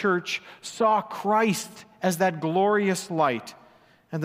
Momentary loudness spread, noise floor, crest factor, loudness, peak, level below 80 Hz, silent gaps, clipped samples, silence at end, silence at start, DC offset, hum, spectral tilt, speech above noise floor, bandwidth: 12 LU; -57 dBFS; 16 dB; -25 LUFS; -8 dBFS; -74 dBFS; none; under 0.1%; 0 s; 0 s; under 0.1%; none; -5 dB/octave; 32 dB; 16 kHz